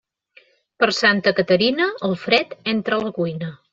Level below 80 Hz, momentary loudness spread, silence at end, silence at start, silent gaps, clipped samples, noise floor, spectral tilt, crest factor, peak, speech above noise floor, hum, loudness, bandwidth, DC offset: -62 dBFS; 9 LU; 0.15 s; 0.8 s; none; under 0.1%; -55 dBFS; -5 dB/octave; 18 dB; -2 dBFS; 35 dB; none; -19 LUFS; 8 kHz; under 0.1%